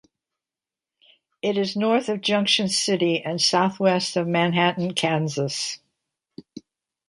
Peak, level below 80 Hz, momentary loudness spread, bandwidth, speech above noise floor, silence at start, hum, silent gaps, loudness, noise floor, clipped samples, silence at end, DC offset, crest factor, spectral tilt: -4 dBFS; -70 dBFS; 9 LU; 11.5 kHz; over 68 dB; 1.45 s; none; none; -22 LUFS; under -90 dBFS; under 0.1%; 0.5 s; under 0.1%; 20 dB; -4 dB/octave